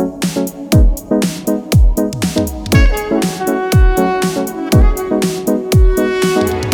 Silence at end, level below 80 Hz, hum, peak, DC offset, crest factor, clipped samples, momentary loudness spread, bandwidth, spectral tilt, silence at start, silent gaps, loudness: 0 s; -16 dBFS; none; 0 dBFS; under 0.1%; 12 dB; under 0.1%; 5 LU; over 20 kHz; -6 dB/octave; 0 s; none; -14 LUFS